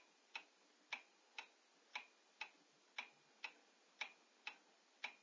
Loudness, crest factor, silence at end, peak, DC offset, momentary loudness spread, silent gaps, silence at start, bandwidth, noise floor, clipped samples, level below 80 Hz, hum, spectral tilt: -55 LUFS; 24 dB; 0 s; -34 dBFS; under 0.1%; 11 LU; none; 0 s; 8 kHz; -73 dBFS; under 0.1%; under -90 dBFS; none; 1 dB/octave